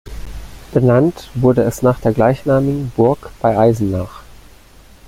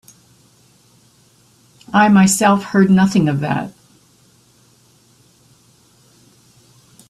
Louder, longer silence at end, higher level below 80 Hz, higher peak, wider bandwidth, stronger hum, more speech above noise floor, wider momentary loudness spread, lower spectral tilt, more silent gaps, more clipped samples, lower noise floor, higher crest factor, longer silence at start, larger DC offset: about the same, -15 LUFS vs -14 LUFS; second, 0.7 s vs 3.4 s; first, -36 dBFS vs -56 dBFS; about the same, 0 dBFS vs 0 dBFS; first, 16 kHz vs 13 kHz; neither; second, 29 dB vs 40 dB; first, 17 LU vs 11 LU; first, -8 dB/octave vs -5.5 dB/octave; neither; neither; second, -43 dBFS vs -53 dBFS; about the same, 16 dB vs 18 dB; second, 0.05 s vs 1.9 s; neither